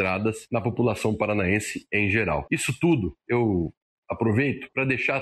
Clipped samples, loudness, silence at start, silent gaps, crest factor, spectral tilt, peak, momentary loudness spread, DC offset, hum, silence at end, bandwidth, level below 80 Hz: under 0.1%; -25 LUFS; 0 s; 3.77-4.03 s; 16 dB; -6 dB/octave; -8 dBFS; 5 LU; under 0.1%; none; 0 s; 12.5 kHz; -50 dBFS